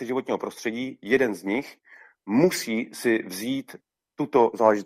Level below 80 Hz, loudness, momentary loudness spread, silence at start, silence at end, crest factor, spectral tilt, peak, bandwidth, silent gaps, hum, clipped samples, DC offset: -70 dBFS; -25 LUFS; 11 LU; 0 s; 0 s; 22 dB; -5 dB/octave; -4 dBFS; 15.5 kHz; none; none; under 0.1%; under 0.1%